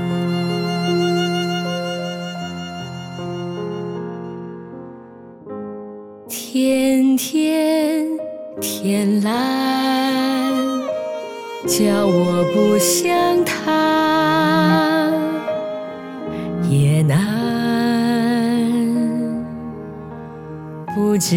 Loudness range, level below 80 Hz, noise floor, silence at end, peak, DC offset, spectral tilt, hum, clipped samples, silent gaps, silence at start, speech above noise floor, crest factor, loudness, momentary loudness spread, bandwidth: 11 LU; -56 dBFS; -39 dBFS; 0 s; -4 dBFS; under 0.1%; -5 dB/octave; none; under 0.1%; none; 0 s; 23 dB; 14 dB; -19 LUFS; 17 LU; 17.5 kHz